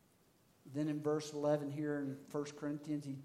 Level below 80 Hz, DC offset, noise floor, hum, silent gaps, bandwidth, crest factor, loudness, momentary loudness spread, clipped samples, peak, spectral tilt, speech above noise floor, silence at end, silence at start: -86 dBFS; under 0.1%; -71 dBFS; none; none; 15 kHz; 18 dB; -40 LUFS; 7 LU; under 0.1%; -22 dBFS; -6.5 dB/octave; 32 dB; 0 s; 0.65 s